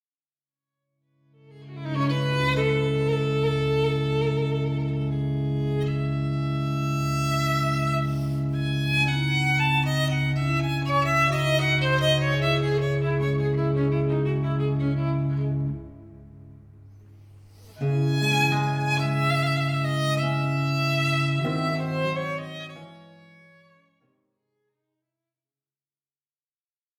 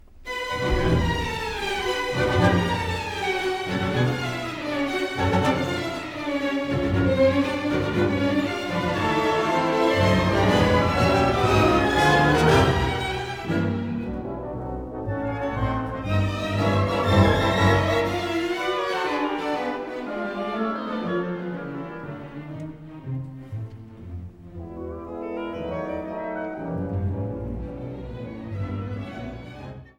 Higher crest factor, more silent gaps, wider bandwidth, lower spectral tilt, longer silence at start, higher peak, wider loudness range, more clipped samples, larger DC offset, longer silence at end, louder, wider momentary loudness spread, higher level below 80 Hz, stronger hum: about the same, 16 dB vs 18 dB; neither; second, 14 kHz vs 17 kHz; about the same, -6 dB/octave vs -6 dB/octave; first, 1.5 s vs 0.1 s; about the same, -8 dBFS vs -6 dBFS; second, 7 LU vs 13 LU; neither; neither; first, 3.95 s vs 0.15 s; about the same, -24 LUFS vs -24 LUFS; second, 6 LU vs 16 LU; second, -48 dBFS vs -40 dBFS; neither